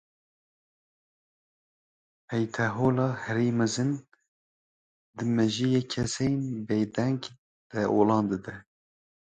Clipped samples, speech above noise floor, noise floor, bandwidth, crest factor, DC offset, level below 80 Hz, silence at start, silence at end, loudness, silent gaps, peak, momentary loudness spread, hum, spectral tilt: under 0.1%; over 63 dB; under -90 dBFS; 9.4 kHz; 20 dB; under 0.1%; -60 dBFS; 2.3 s; 0.6 s; -28 LUFS; 4.28-5.13 s, 7.38-7.70 s; -10 dBFS; 11 LU; none; -6 dB/octave